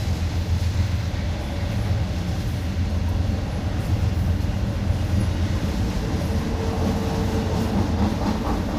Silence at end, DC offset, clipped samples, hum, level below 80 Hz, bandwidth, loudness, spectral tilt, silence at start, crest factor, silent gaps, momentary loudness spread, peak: 0 s; under 0.1%; under 0.1%; none; -28 dBFS; 15 kHz; -24 LUFS; -7 dB/octave; 0 s; 14 dB; none; 3 LU; -10 dBFS